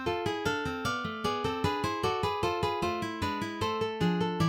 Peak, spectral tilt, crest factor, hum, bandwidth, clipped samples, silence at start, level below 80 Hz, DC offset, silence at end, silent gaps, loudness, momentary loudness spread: -16 dBFS; -5.5 dB/octave; 16 dB; none; 17 kHz; under 0.1%; 0 s; -52 dBFS; under 0.1%; 0 s; none; -31 LUFS; 3 LU